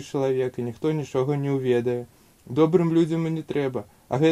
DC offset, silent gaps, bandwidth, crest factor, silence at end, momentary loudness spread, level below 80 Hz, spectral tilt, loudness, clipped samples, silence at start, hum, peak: under 0.1%; none; 14 kHz; 18 dB; 0 s; 10 LU; -64 dBFS; -8 dB/octave; -24 LUFS; under 0.1%; 0 s; none; -6 dBFS